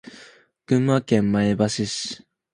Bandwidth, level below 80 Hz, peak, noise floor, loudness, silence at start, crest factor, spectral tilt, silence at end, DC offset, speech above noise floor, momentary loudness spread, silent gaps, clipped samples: 11 kHz; -54 dBFS; -4 dBFS; -50 dBFS; -22 LUFS; 0.05 s; 18 dB; -5.5 dB/octave; 0.35 s; under 0.1%; 29 dB; 10 LU; none; under 0.1%